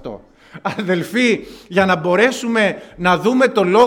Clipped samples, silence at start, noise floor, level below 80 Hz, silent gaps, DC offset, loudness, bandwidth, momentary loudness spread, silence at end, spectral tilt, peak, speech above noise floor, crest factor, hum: under 0.1%; 0.05 s; -39 dBFS; -52 dBFS; none; under 0.1%; -16 LUFS; 17 kHz; 9 LU; 0 s; -5 dB/octave; 0 dBFS; 23 dB; 16 dB; none